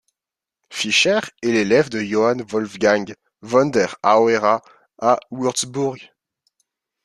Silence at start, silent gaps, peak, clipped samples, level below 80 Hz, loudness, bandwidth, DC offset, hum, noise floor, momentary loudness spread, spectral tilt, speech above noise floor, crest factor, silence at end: 0.7 s; none; -2 dBFS; under 0.1%; -62 dBFS; -19 LUFS; 12.5 kHz; under 0.1%; none; -88 dBFS; 10 LU; -3.5 dB/octave; 70 dB; 18 dB; 1 s